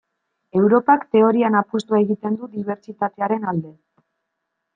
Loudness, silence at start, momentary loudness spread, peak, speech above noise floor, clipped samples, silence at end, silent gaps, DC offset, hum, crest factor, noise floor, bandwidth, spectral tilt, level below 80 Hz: -19 LUFS; 0.55 s; 12 LU; -2 dBFS; 59 dB; under 0.1%; 1.05 s; none; under 0.1%; none; 18 dB; -78 dBFS; 7.6 kHz; -8 dB/octave; -68 dBFS